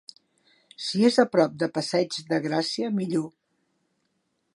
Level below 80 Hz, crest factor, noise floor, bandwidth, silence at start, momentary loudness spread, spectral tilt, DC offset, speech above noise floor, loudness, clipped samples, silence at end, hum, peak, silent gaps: -76 dBFS; 20 dB; -74 dBFS; 11.5 kHz; 0.8 s; 9 LU; -5 dB/octave; under 0.1%; 50 dB; -25 LUFS; under 0.1%; 1.25 s; none; -6 dBFS; none